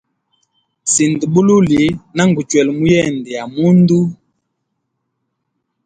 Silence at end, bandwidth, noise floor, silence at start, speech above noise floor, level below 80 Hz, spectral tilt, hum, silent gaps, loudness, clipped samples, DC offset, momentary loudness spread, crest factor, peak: 1.7 s; 9.6 kHz; -72 dBFS; 0.85 s; 59 dB; -48 dBFS; -5.5 dB/octave; none; none; -13 LUFS; under 0.1%; under 0.1%; 10 LU; 14 dB; 0 dBFS